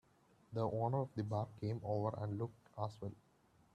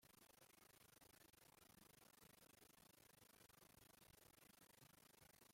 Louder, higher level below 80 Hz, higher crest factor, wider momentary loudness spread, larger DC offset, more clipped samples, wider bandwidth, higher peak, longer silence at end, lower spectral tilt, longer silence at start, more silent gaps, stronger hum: first, -42 LUFS vs -69 LUFS; first, -72 dBFS vs -88 dBFS; about the same, 18 dB vs 18 dB; first, 9 LU vs 1 LU; neither; neither; second, 8.4 kHz vs 16.5 kHz; first, -24 dBFS vs -54 dBFS; first, 0.6 s vs 0 s; first, -9.5 dB/octave vs -2.5 dB/octave; first, 0.5 s vs 0 s; neither; neither